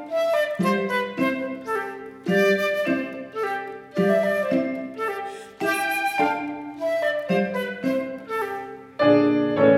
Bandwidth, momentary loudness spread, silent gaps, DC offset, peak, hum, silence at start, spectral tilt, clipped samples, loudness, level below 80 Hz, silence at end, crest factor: 16 kHz; 11 LU; none; under 0.1%; -6 dBFS; none; 0 s; -6 dB/octave; under 0.1%; -24 LUFS; -68 dBFS; 0 s; 18 dB